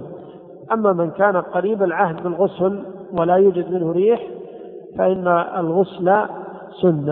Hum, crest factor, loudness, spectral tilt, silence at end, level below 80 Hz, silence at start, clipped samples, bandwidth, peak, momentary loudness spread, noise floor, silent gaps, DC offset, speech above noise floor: none; 16 dB; -19 LUFS; -12 dB/octave; 0 s; -60 dBFS; 0 s; under 0.1%; 4 kHz; -2 dBFS; 17 LU; -39 dBFS; none; under 0.1%; 21 dB